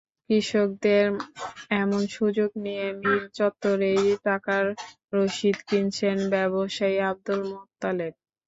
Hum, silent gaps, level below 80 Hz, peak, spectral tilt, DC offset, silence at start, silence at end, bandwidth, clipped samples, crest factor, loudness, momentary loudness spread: none; 5.04-5.08 s; -66 dBFS; -10 dBFS; -5.5 dB/octave; under 0.1%; 0.3 s; 0.35 s; 8 kHz; under 0.1%; 16 dB; -25 LUFS; 8 LU